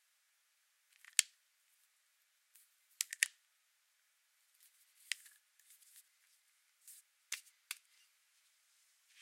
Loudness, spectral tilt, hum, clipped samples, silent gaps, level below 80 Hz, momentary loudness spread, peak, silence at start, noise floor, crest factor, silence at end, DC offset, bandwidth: -39 LUFS; 9 dB/octave; none; under 0.1%; none; under -90 dBFS; 26 LU; -4 dBFS; 1.2 s; -78 dBFS; 44 dB; 1.45 s; under 0.1%; 16.5 kHz